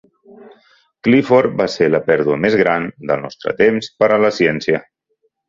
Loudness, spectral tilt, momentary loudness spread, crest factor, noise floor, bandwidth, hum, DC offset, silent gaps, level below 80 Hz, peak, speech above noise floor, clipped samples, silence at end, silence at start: -16 LUFS; -6.5 dB/octave; 8 LU; 16 dB; -66 dBFS; 7.6 kHz; none; under 0.1%; none; -54 dBFS; 0 dBFS; 51 dB; under 0.1%; 0.65 s; 0.4 s